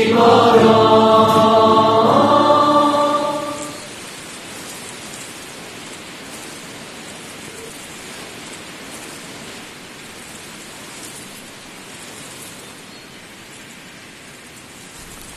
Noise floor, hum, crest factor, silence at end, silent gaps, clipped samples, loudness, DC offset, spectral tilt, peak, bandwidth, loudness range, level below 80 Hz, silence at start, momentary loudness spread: -39 dBFS; none; 18 dB; 0 s; none; under 0.1%; -13 LUFS; under 0.1%; -4.5 dB/octave; 0 dBFS; 13 kHz; 22 LU; -56 dBFS; 0 s; 25 LU